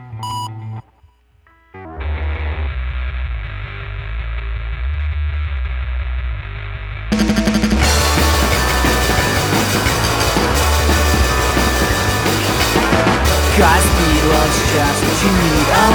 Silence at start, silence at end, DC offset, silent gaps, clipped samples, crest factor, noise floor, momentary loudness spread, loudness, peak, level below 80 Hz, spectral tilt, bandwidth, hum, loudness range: 0 s; 0 s; under 0.1%; none; under 0.1%; 16 dB; -52 dBFS; 14 LU; -15 LUFS; 0 dBFS; -22 dBFS; -4 dB/octave; over 20 kHz; none; 12 LU